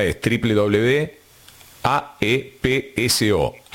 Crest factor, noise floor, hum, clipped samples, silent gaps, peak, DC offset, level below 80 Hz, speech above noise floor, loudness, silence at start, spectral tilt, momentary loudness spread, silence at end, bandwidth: 18 dB; -47 dBFS; none; under 0.1%; none; -2 dBFS; under 0.1%; -42 dBFS; 28 dB; -20 LUFS; 0 s; -4.5 dB/octave; 5 LU; 0.2 s; 17 kHz